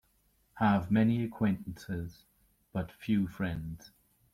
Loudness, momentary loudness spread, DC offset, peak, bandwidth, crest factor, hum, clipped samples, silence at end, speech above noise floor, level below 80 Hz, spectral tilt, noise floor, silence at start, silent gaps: -32 LUFS; 13 LU; under 0.1%; -14 dBFS; 15 kHz; 18 dB; none; under 0.1%; 0.45 s; 40 dB; -58 dBFS; -8 dB/octave; -71 dBFS; 0.55 s; none